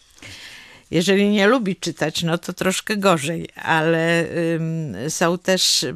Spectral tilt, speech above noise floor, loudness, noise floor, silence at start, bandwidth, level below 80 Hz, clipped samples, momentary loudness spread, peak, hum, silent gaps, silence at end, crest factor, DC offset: -4 dB/octave; 22 dB; -20 LUFS; -42 dBFS; 0.2 s; 15.5 kHz; -58 dBFS; under 0.1%; 11 LU; -2 dBFS; none; none; 0 s; 18 dB; under 0.1%